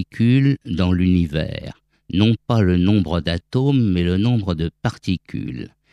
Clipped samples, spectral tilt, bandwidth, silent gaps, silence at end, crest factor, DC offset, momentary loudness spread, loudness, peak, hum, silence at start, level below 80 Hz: under 0.1%; -8 dB/octave; 10.5 kHz; none; 0.25 s; 18 dB; under 0.1%; 12 LU; -19 LUFS; -2 dBFS; none; 0 s; -40 dBFS